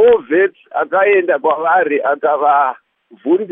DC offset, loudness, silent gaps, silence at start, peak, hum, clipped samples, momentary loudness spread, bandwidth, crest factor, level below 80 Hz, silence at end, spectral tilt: under 0.1%; -14 LUFS; none; 0 s; -2 dBFS; none; under 0.1%; 7 LU; 3.7 kHz; 12 dB; -60 dBFS; 0 s; -8.5 dB/octave